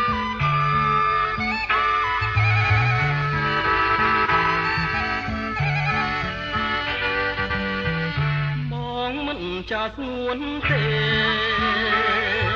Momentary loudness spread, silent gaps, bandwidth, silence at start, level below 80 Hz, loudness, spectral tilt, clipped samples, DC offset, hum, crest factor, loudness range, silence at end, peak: 8 LU; none; 7.4 kHz; 0 s; -40 dBFS; -21 LUFS; -6.5 dB/octave; under 0.1%; under 0.1%; none; 14 dB; 5 LU; 0 s; -8 dBFS